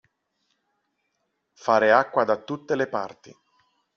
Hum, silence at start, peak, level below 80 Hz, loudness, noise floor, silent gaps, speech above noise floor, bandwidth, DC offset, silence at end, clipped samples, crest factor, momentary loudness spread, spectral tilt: none; 1.65 s; -4 dBFS; -74 dBFS; -23 LUFS; -76 dBFS; none; 53 dB; 7 kHz; under 0.1%; 0.85 s; under 0.1%; 22 dB; 14 LU; -3 dB/octave